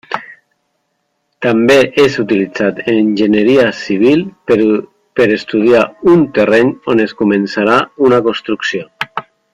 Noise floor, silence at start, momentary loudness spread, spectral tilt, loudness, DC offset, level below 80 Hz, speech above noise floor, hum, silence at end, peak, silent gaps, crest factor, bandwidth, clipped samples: -66 dBFS; 0.1 s; 9 LU; -6 dB/octave; -12 LUFS; under 0.1%; -50 dBFS; 55 dB; none; 0.3 s; 0 dBFS; none; 12 dB; 11.5 kHz; under 0.1%